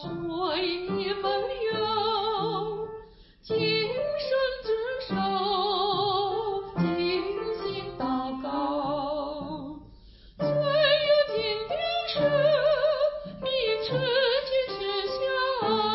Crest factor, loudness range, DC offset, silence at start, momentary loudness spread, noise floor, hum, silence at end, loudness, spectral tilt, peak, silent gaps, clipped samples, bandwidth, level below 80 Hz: 16 dB; 5 LU; under 0.1%; 0 s; 9 LU; -51 dBFS; none; 0 s; -27 LUFS; -9 dB/octave; -10 dBFS; none; under 0.1%; 5.8 kHz; -54 dBFS